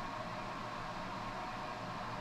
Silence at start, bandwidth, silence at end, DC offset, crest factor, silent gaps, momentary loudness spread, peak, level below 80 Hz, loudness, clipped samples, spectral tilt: 0 s; 13.5 kHz; 0 s; under 0.1%; 12 dB; none; 1 LU; -30 dBFS; -56 dBFS; -43 LUFS; under 0.1%; -5 dB/octave